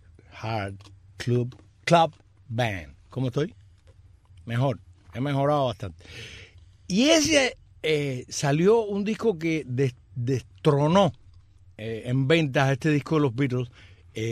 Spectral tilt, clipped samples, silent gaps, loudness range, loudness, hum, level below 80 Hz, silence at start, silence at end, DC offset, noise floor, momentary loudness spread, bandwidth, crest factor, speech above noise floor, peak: -5.5 dB/octave; under 0.1%; none; 6 LU; -25 LUFS; none; -56 dBFS; 0.35 s; 0 s; under 0.1%; -54 dBFS; 17 LU; 14 kHz; 20 dB; 30 dB; -6 dBFS